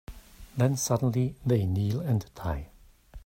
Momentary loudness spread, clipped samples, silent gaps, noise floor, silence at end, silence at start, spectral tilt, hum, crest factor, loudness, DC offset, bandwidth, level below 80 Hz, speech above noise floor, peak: 10 LU; under 0.1%; none; -49 dBFS; 0.05 s; 0.1 s; -6.5 dB/octave; none; 18 dB; -28 LUFS; under 0.1%; 16 kHz; -48 dBFS; 22 dB; -10 dBFS